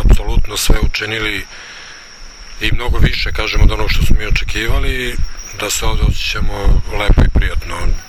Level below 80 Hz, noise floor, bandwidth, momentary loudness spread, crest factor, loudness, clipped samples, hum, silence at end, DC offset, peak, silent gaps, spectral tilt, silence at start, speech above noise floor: -14 dBFS; -33 dBFS; 15 kHz; 15 LU; 12 dB; -17 LUFS; 0.1%; none; 0 s; under 0.1%; 0 dBFS; none; -4 dB/octave; 0 s; 21 dB